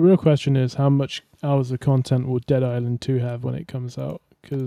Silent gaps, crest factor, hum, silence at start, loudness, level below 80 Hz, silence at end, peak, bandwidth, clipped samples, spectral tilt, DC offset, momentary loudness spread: none; 14 dB; none; 0 s; -22 LUFS; -56 dBFS; 0 s; -6 dBFS; 10.5 kHz; under 0.1%; -8 dB/octave; under 0.1%; 12 LU